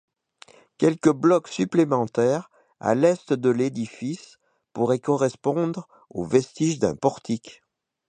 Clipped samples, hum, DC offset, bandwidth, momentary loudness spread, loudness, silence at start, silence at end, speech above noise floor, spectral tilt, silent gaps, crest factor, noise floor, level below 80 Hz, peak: under 0.1%; none; under 0.1%; 9.6 kHz; 12 LU; -23 LUFS; 0.8 s; 0.6 s; 31 dB; -6.5 dB/octave; none; 20 dB; -53 dBFS; -62 dBFS; -4 dBFS